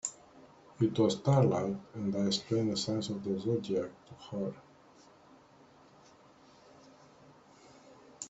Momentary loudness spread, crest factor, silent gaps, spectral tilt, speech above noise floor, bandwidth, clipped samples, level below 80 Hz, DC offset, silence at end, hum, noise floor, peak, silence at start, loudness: 13 LU; 22 dB; none; -6 dB/octave; 28 dB; 8.2 kHz; under 0.1%; -70 dBFS; under 0.1%; 0 s; none; -60 dBFS; -14 dBFS; 0.05 s; -32 LUFS